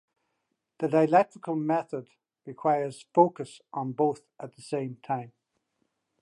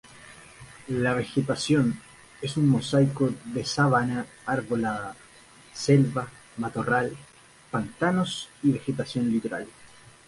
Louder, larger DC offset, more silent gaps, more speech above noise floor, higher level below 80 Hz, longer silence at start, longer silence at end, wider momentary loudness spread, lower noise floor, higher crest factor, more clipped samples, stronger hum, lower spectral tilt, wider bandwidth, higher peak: about the same, -28 LUFS vs -26 LUFS; neither; neither; first, 53 dB vs 27 dB; second, -82 dBFS vs -58 dBFS; first, 0.8 s vs 0.15 s; first, 0.95 s vs 0.4 s; about the same, 17 LU vs 17 LU; first, -80 dBFS vs -52 dBFS; about the same, 22 dB vs 20 dB; neither; neither; first, -7.5 dB/octave vs -6 dB/octave; about the same, 11.5 kHz vs 11.5 kHz; about the same, -6 dBFS vs -8 dBFS